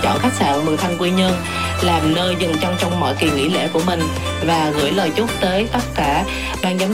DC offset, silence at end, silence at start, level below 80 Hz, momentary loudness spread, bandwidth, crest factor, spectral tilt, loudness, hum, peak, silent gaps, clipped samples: 0.8%; 0 s; 0 s; -36 dBFS; 4 LU; 16.5 kHz; 14 dB; -5 dB/octave; -18 LUFS; none; -4 dBFS; none; under 0.1%